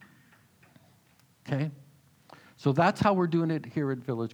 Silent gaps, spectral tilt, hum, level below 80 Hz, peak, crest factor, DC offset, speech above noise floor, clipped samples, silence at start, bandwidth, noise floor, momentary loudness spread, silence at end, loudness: none; -7.5 dB/octave; none; -66 dBFS; -10 dBFS; 20 dB; under 0.1%; 36 dB; under 0.1%; 1.45 s; 13 kHz; -63 dBFS; 10 LU; 0.05 s; -28 LUFS